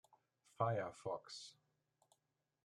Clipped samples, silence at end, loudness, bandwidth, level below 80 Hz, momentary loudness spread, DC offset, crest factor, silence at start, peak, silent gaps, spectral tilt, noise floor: under 0.1%; 1.1 s; -44 LUFS; 11 kHz; -84 dBFS; 13 LU; under 0.1%; 26 dB; 0.6 s; -22 dBFS; none; -5.5 dB/octave; -88 dBFS